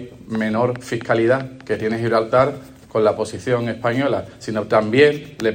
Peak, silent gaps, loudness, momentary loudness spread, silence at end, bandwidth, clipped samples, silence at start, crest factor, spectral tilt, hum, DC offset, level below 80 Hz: -2 dBFS; none; -19 LUFS; 10 LU; 0 s; 16 kHz; under 0.1%; 0 s; 18 dB; -6.5 dB/octave; none; under 0.1%; -54 dBFS